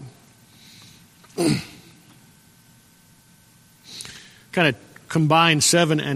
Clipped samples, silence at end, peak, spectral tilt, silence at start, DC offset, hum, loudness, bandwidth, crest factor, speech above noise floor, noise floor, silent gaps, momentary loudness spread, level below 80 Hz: under 0.1%; 0 s; -2 dBFS; -4 dB/octave; 0 s; under 0.1%; none; -19 LUFS; 15.5 kHz; 22 dB; 35 dB; -54 dBFS; none; 23 LU; -60 dBFS